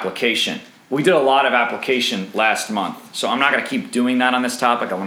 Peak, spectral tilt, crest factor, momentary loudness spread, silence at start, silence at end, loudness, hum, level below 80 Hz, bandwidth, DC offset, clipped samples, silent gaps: -2 dBFS; -3.5 dB/octave; 18 dB; 9 LU; 0 s; 0 s; -18 LUFS; none; -74 dBFS; 16.5 kHz; under 0.1%; under 0.1%; none